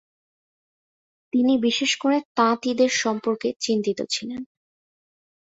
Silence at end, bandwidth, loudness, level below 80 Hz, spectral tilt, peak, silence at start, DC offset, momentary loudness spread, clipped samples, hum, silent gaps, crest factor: 1 s; 8 kHz; -22 LUFS; -70 dBFS; -3 dB/octave; -6 dBFS; 1.35 s; under 0.1%; 7 LU; under 0.1%; none; 2.25-2.35 s, 3.56-3.60 s; 18 dB